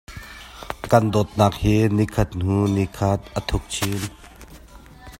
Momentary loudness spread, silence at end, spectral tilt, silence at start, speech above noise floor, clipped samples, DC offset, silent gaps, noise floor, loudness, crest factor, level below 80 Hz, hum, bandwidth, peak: 17 LU; 0.05 s; -6 dB/octave; 0.1 s; 24 dB; under 0.1%; under 0.1%; none; -44 dBFS; -21 LUFS; 22 dB; -38 dBFS; none; 16.5 kHz; 0 dBFS